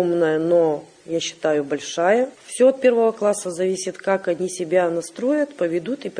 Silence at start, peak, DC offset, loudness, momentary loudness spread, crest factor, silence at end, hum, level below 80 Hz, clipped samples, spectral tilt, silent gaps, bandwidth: 0 s; -6 dBFS; under 0.1%; -21 LUFS; 8 LU; 16 dB; 0 s; none; -70 dBFS; under 0.1%; -4.5 dB/octave; none; 10 kHz